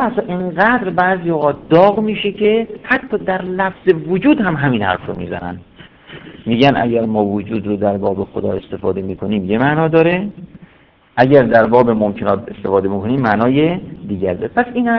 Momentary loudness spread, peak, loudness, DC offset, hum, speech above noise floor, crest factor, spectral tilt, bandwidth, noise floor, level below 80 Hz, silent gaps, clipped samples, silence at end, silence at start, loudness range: 11 LU; 0 dBFS; -15 LUFS; under 0.1%; none; 34 dB; 16 dB; -9 dB/octave; 5.4 kHz; -49 dBFS; -46 dBFS; none; 0.2%; 0 s; 0 s; 4 LU